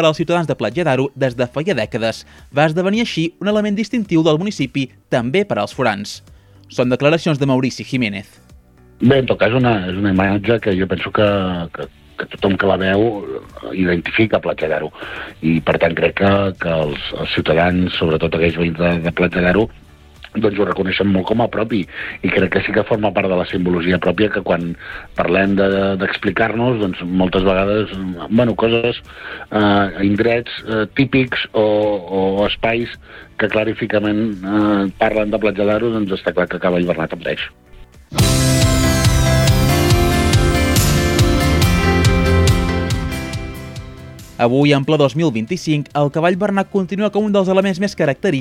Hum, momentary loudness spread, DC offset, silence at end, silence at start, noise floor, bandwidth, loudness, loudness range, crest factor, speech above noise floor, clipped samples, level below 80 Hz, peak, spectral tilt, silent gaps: none; 9 LU; under 0.1%; 0 s; 0 s; -45 dBFS; 17 kHz; -17 LUFS; 4 LU; 16 dB; 29 dB; under 0.1%; -30 dBFS; 0 dBFS; -5.5 dB/octave; none